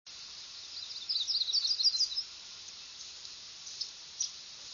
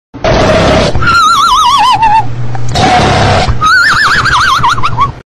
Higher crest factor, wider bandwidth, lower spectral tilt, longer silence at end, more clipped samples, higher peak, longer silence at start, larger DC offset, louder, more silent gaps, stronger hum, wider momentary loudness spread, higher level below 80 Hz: first, 20 dB vs 8 dB; second, 7.4 kHz vs 15 kHz; second, 3 dB/octave vs -4 dB/octave; about the same, 0 s vs 0 s; neither; second, -16 dBFS vs 0 dBFS; about the same, 0.05 s vs 0.15 s; neither; second, -31 LUFS vs -7 LUFS; neither; neither; first, 18 LU vs 6 LU; second, -76 dBFS vs -22 dBFS